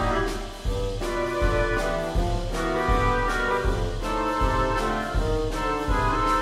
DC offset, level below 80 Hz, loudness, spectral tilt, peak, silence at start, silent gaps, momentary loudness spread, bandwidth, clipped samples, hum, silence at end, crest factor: under 0.1%; -30 dBFS; -25 LUFS; -5.5 dB/octave; -10 dBFS; 0 s; none; 5 LU; 14.5 kHz; under 0.1%; none; 0 s; 14 dB